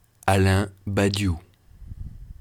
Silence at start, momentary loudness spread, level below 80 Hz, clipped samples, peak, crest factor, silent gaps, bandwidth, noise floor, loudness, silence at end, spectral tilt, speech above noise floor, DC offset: 0.25 s; 21 LU; -42 dBFS; under 0.1%; -4 dBFS; 20 dB; none; 14 kHz; -43 dBFS; -23 LUFS; 0.1 s; -6 dB/octave; 21 dB; under 0.1%